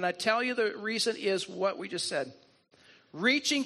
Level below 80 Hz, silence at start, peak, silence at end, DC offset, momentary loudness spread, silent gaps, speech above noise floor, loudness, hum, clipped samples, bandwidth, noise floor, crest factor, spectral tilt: -80 dBFS; 0 s; -10 dBFS; 0 s; under 0.1%; 8 LU; none; 31 dB; -30 LUFS; none; under 0.1%; 13 kHz; -61 dBFS; 20 dB; -2.5 dB/octave